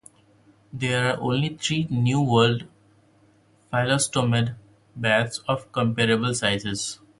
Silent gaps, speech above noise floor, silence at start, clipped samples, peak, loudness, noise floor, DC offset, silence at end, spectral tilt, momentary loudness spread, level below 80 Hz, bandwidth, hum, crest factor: none; 36 dB; 0.75 s; under 0.1%; -4 dBFS; -23 LUFS; -59 dBFS; under 0.1%; 0.25 s; -4.5 dB/octave; 9 LU; -56 dBFS; 11.5 kHz; none; 20 dB